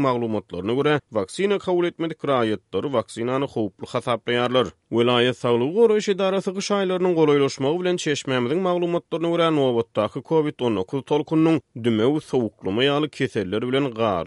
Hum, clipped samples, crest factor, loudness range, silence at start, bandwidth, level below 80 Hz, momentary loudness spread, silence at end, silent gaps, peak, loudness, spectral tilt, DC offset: none; under 0.1%; 16 dB; 3 LU; 0 s; 11.5 kHz; -62 dBFS; 7 LU; 0 s; none; -6 dBFS; -22 LUFS; -6 dB/octave; under 0.1%